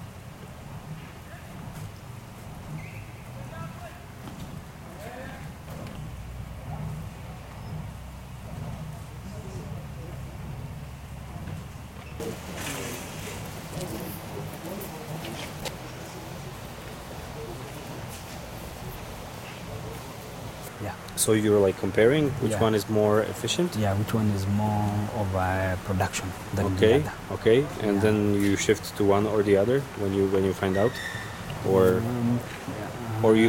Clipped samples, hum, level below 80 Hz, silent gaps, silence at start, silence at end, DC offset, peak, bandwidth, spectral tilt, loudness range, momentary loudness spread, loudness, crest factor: under 0.1%; none; -48 dBFS; none; 0 s; 0 s; under 0.1%; -6 dBFS; 16.5 kHz; -5.5 dB/octave; 16 LU; 18 LU; -27 LUFS; 20 dB